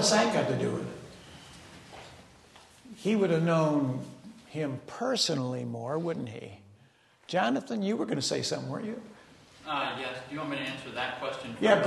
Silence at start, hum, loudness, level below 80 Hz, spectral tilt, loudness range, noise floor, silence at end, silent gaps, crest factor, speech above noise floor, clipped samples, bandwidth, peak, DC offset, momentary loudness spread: 0 s; none; -31 LUFS; -68 dBFS; -4.5 dB/octave; 4 LU; -62 dBFS; 0 s; none; 22 dB; 32 dB; under 0.1%; 12.5 kHz; -8 dBFS; under 0.1%; 22 LU